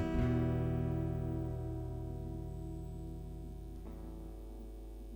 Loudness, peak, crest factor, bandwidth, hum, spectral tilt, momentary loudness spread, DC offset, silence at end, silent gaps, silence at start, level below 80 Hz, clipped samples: -40 LUFS; -22 dBFS; 16 dB; 19.5 kHz; none; -9 dB/octave; 16 LU; under 0.1%; 0 s; none; 0 s; -46 dBFS; under 0.1%